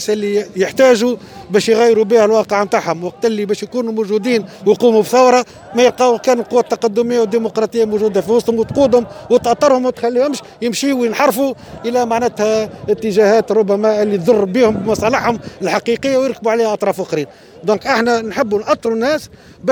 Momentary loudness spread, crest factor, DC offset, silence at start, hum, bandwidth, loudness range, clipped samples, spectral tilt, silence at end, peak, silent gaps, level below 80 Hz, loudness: 8 LU; 14 dB; under 0.1%; 0 s; none; over 20 kHz; 3 LU; under 0.1%; -5 dB/octave; 0 s; 0 dBFS; none; -50 dBFS; -15 LUFS